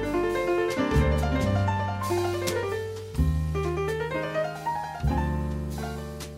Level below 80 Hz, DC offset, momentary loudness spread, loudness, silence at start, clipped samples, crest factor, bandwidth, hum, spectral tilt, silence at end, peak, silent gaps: -34 dBFS; under 0.1%; 8 LU; -28 LUFS; 0 s; under 0.1%; 16 dB; 16 kHz; none; -6.5 dB/octave; 0 s; -12 dBFS; none